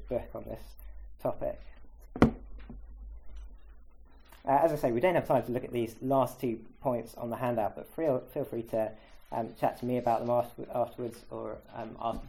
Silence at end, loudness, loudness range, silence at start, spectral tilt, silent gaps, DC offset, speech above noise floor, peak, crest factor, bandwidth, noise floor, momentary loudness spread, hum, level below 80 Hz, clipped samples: 0 s; -32 LUFS; 5 LU; 0 s; -7.5 dB/octave; none; under 0.1%; 21 dB; -6 dBFS; 26 dB; 17 kHz; -53 dBFS; 22 LU; none; -50 dBFS; under 0.1%